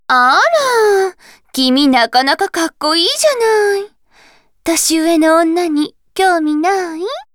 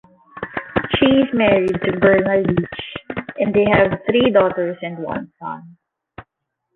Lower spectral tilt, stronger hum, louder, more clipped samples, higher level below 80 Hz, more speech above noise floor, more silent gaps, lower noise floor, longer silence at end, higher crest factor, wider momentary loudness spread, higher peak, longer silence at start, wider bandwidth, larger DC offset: second, -1 dB/octave vs -8.5 dB/octave; neither; first, -13 LUFS vs -17 LUFS; neither; second, -56 dBFS vs -46 dBFS; second, 36 dB vs 60 dB; neither; second, -49 dBFS vs -77 dBFS; second, 0.1 s vs 0.55 s; about the same, 12 dB vs 16 dB; second, 10 LU vs 15 LU; about the same, 0 dBFS vs -2 dBFS; second, 0.1 s vs 0.35 s; first, 19.5 kHz vs 4.3 kHz; neither